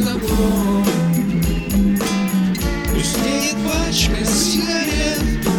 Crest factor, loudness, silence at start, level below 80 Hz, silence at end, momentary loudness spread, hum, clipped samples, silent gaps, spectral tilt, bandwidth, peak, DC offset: 14 dB; -18 LUFS; 0 s; -26 dBFS; 0 s; 3 LU; none; under 0.1%; none; -4.5 dB/octave; 20 kHz; -2 dBFS; under 0.1%